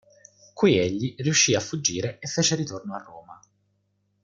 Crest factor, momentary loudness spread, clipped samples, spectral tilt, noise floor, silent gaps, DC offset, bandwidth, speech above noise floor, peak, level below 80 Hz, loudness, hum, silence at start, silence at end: 20 dB; 14 LU; under 0.1%; -3.5 dB/octave; -71 dBFS; none; under 0.1%; 11 kHz; 47 dB; -8 dBFS; -62 dBFS; -23 LUFS; 50 Hz at -50 dBFS; 0.55 s; 0.9 s